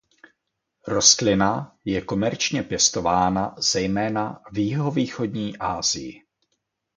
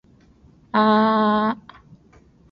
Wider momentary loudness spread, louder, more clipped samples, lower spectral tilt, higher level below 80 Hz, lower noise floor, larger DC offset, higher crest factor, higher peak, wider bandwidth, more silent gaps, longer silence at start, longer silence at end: about the same, 11 LU vs 9 LU; second, -22 LUFS vs -19 LUFS; neither; second, -3 dB/octave vs -8.5 dB/octave; first, -50 dBFS vs -58 dBFS; first, -78 dBFS vs -53 dBFS; neither; first, 22 dB vs 16 dB; first, -2 dBFS vs -6 dBFS; first, 10.5 kHz vs 5.4 kHz; neither; about the same, 0.85 s vs 0.75 s; second, 0.8 s vs 1 s